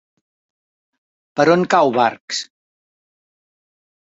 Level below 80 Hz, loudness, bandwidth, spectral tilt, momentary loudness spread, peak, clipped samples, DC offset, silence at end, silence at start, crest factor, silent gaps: -66 dBFS; -16 LUFS; 8 kHz; -4.5 dB/octave; 13 LU; -2 dBFS; under 0.1%; under 0.1%; 1.7 s; 1.35 s; 20 dB; 2.21-2.28 s